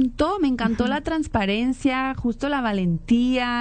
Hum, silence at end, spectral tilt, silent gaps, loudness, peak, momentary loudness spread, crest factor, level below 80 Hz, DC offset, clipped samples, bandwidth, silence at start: none; 0 s; -6 dB/octave; none; -23 LUFS; -10 dBFS; 4 LU; 12 dB; -40 dBFS; under 0.1%; under 0.1%; 9.2 kHz; 0 s